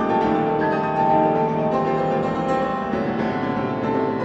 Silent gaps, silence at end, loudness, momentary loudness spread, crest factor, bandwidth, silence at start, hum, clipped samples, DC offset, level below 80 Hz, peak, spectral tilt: none; 0 s; -21 LUFS; 5 LU; 14 dB; 8 kHz; 0 s; none; under 0.1%; under 0.1%; -50 dBFS; -6 dBFS; -8 dB/octave